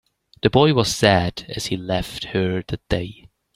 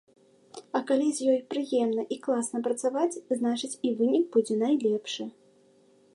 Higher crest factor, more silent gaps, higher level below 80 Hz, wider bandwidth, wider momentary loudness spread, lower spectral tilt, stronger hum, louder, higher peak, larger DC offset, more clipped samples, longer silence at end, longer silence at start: about the same, 20 dB vs 16 dB; neither; first, -42 dBFS vs -82 dBFS; first, 15.5 kHz vs 11.5 kHz; first, 11 LU vs 8 LU; about the same, -5 dB/octave vs -4 dB/octave; neither; first, -20 LUFS vs -28 LUFS; first, 0 dBFS vs -12 dBFS; neither; neither; second, 0.4 s vs 0.85 s; about the same, 0.45 s vs 0.55 s